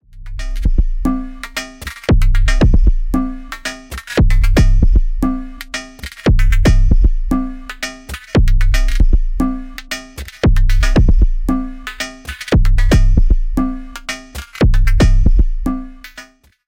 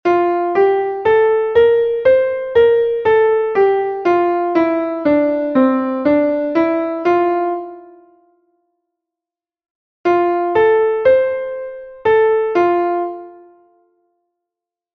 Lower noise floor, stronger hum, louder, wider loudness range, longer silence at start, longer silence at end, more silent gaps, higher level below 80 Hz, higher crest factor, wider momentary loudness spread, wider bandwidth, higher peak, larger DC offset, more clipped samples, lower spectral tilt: second, -40 dBFS vs -89 dBFS; neither; about the same, -17 LUFS vs -15 LUFS; second, 2 LU vs 7 LU; about the same, 0.15 s vs 0.05 s; second, 0.45 s vs 1.6 s; second, none vs 9.70-10.04 s; first, -14 dBFS vs -54 dBFS; about the same, 12 dB vs 14 dB; first, 14 LU vs 8 LU; first, 11 kHz vs 6.2 kHz; about the same, 0 dBFS vs -2 dBFS; neither; neither; second, -6 dB/octave vs -7.5 dB/octave